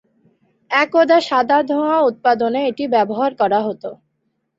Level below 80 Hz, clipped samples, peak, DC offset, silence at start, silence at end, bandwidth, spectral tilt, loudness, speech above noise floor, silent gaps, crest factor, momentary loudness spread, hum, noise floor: -66 dBFS; under 0.1%; -2 dBFS; under 0.1%; 0.7 s; 0.65 s; 7.8 kHz; -5.5 dB/octave; -16 LUFS; 54 dB; none; 16 dB; 6 LU; none; -70 dBFS